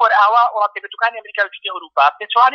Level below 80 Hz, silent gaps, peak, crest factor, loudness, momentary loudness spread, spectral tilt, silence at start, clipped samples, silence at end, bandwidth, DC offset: -78 dBFS; none; 0 dBFS; 16 dB; -16 LUFS; 9 LU; 0 dB/octave; 0 s; under 0.1%; 0 s; 6.6 kHz; under 0.1%